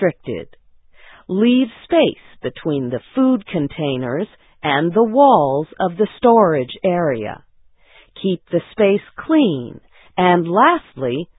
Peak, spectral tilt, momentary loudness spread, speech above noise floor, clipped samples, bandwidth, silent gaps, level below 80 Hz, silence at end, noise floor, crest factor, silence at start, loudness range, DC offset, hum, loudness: 0 dBFS; -11.5 dB/octave; 15 LU; 33 dB; under 0.1%; 4 kHz; none; -54 dBFS; 0.15 s; -50 dBFS; 18 dB; 0 s; 4 LU; under 0.1%; none; -17 LUFS